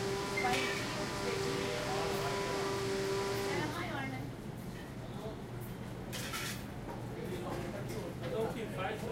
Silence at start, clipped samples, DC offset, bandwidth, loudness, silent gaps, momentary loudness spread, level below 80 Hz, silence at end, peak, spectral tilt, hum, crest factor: 0 s; under 0.1%; under 0.1%; 16 kHz; -38 LUFS; none; 10 LU; -56 dBFS; 0 s; -20 dBFS; -4.5 dB/octave; none; 18 dB